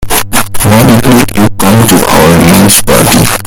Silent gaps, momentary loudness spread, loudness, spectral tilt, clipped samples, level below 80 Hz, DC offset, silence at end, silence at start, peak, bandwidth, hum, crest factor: none; 5 LU; -5 LUFS; -4.5 dB/octave; 10%; -24 dBFS; under 0.1%; 0 s; 0 s; 0 dBFS; over 20 kHz; none; 4 dB